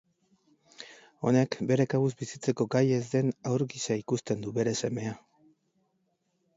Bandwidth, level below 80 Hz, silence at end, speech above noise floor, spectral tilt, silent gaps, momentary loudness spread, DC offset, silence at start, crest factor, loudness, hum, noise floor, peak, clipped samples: 8 kHz; -70 dBFS; 1.4 s; 47 dB; -6 dB/octave; none; 16 LU; under 0.1%; 0.8 s; 20 dB; -29 LUFS; none; -75 dBFS; -10 dBFS; under 0.1%